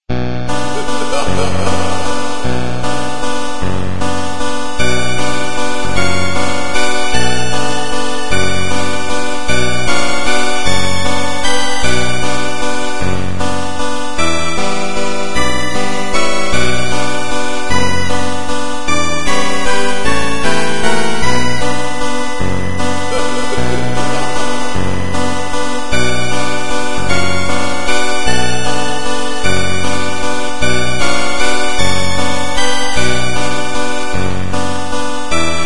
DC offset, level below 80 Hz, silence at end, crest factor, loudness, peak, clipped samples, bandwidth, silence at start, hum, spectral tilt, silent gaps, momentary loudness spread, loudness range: 40%; -30 dBFS; 0 s; 16 dB; -17 LUFS; 0 dBFS; under 0.1%; 11.5 kHz; 0 s; none; -3.5 dB/octave; none; 4 LU; 2 LU